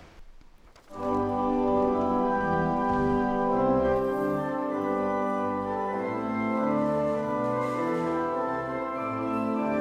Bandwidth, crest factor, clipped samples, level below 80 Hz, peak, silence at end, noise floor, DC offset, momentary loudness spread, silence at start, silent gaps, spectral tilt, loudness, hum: 14 kHz; 14 dB; under 0.1%; -50 dBFS; -14 dBFS; 0 s; -52 dBFS; under 0.1%; 5 LU; 0 s; none; -8 dB/octave; -27 LUFS; none